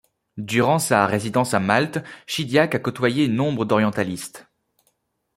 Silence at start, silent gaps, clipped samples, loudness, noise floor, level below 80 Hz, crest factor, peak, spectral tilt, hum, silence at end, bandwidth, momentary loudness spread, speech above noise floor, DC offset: 0.35 s; none; under 0.1%; -21 LUFS; -69 dBFS; -60 dBFS; 20 dB; -2 dBFS; -5 dB/octave; none; 0.95 s; 16 kHz; 12 LU; 49 dB; under 0.1%